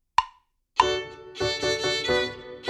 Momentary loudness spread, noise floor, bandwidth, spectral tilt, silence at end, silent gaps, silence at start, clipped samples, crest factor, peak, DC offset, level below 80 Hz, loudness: 8 LU; -57 dBFS; 13.5 kHz; -3 dB/octave; 0 s; none; 0.2 s; under 0.1%; 24 dB; -2 dBFS; under 0.1%; -52 dBFS; -26 LUFS